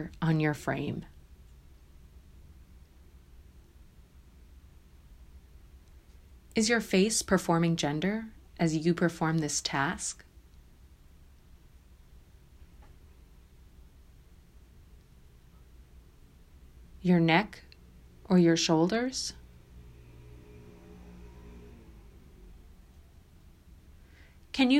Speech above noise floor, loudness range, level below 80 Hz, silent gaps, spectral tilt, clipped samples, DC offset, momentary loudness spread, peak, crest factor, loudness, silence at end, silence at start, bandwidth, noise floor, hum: 28 dB; 18 LU; -54 dBFS; none; -5 dB/octave; under 0.1%; under 0.1%; 28 LU; -8 dBFS; 24 dB; -28 LUFS; 0 s; 0 s; 15 kHz; -56 dBFS; none